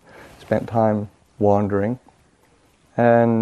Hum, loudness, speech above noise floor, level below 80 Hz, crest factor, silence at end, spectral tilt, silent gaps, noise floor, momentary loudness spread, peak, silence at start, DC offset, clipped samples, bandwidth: none; -20 LUFS; 40 dB; -58 dBFS; 18 dB; 0 s; -9.5 dB/octave; none; -57 dBFS; 14 LU; -2 dBFS; 0.5 s; under 0.1%; under 0.1%; 9.8 kHz